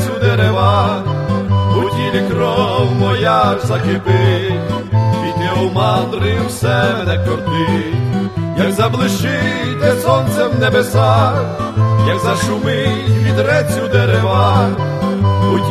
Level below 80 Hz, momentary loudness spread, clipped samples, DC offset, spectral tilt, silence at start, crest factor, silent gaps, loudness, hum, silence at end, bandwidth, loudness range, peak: -40 dBFS; 5 LU; under 0.1%; under 0.1%; -6.5 dB/octave; 0 s; 14 dB; none; -14 LUFS; none; 0 s; 13.5 kHz; 2 LU; 0 dBFS